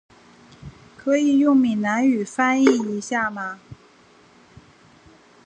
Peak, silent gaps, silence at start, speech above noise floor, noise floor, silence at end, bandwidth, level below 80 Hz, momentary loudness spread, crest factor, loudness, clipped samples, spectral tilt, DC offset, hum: -4 dBFS; none; 0.6 s; 33 dB; -53 dBFS; 1.7 s; 9.4 kHz; -60 dBFS; 14 LU; 20 dB; -20 LUFS; under 0.1%; -5 dB/octave; under 0.1%; none